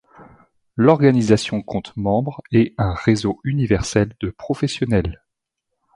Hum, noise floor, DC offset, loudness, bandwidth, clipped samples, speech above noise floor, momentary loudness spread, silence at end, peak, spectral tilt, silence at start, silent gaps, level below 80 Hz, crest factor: none; -79 dBFS; under 0.1%; -19 LUFS; 11.5 kHz; under 0.1%; 60 dB; 11 LU; 0.8 s; 0 dBFS; -6.5 dB/octave; 0.2 s; none; -40 dBFS; 18 dB